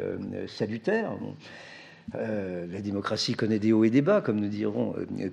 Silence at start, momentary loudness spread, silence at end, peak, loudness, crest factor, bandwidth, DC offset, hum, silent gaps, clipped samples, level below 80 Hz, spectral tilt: 0 s; 18 LU; 0 s; -10 dBFS; -28 LUFS; 18 dB; 10.5 kHz; under 0.1%; none; none; under 0.1%; -70 dBFS; -6.5 dB/octave